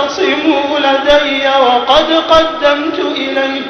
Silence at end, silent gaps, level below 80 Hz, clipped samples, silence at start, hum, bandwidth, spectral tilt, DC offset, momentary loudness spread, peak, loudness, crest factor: 0 s; none; -38 dBFS; 0.1%; 0 s; none; 6.6 kHz; -3 dB/octave; under 0.1%; 6 LU; 0 dBFS; -11 LUFS; 12 dB